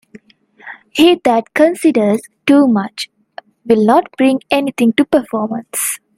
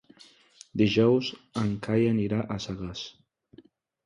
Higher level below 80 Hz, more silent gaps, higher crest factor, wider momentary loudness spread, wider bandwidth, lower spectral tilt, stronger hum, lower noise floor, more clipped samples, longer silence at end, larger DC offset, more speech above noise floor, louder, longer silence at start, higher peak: about the same, -56 dBFS vs -56 dBFS; neither; about the same, 14 dB vs 18 dB; about the same, 13 LU vs 14 LU; first, 16 kHz vs 10.5 kHz; second, -4.5 dB/octave vs -6.5 dB/octave; neither; second, -46 dBFS vs -57 dBFS; neither; second, 0.2 s vs 0.95 s; neither; about the same, 34 dB vs 31 dB; first, -14 LUFS vs -27 LUFS; second, 0.15 s vs 0.75 s; first, 0 dBFS vs -10 dBFS